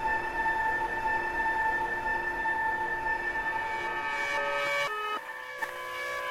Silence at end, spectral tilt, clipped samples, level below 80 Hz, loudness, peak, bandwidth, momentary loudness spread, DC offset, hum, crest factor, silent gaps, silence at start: 0 s; -3 dB/octave; under 0.1%; -52 dBFS; -30 LUFS; -18 dBFS; 16 kHz; 7 LU; under 0.1%; none; 12 dB; none; 0 s